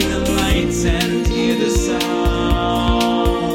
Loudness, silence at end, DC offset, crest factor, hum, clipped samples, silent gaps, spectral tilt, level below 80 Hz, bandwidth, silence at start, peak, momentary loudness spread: -17 LUFS; 0 s; under 0.1%; 14 dB; none; under 0.1%; none; -5 dB/octave; -24 dBFS; 17 kHz; 0 s; -2 dBFS; 2 LU